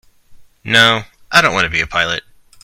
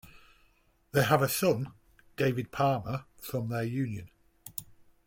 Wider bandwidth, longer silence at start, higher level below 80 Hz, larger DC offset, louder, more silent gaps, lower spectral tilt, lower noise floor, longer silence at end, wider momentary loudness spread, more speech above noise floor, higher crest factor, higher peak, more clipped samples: first, over 20 kHz vs 17 kHz; first, 0.3 s vs 0.05 s; first, -44 dBFS vs -62 dBFS; neither; first, -13 LUFS vs -30 LUFS; neither; second, -2.5 dB/octave vs -5.5 dB/octave; second, -41 dBFS vs -66 dBFS; about the same, 0.45 s vs 0.35 s; second, 11 LU vs 16 LU; second, 28 dB vs 37 dB; second, 16 dB vs 22 dB; first, 0 dBFS vs -10 dBFS; first, 0.1% vs under 0.1%